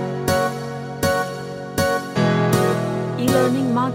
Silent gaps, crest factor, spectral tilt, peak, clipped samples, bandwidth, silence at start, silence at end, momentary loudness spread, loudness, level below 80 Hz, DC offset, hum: none; 16 dB; -5.5 dB/octave; -4 dBFS; under 0.1%; 17 kHz; 0 s; 0 s; 9 LU; -20 LUFS; -46 dBFS; under 0.1%; none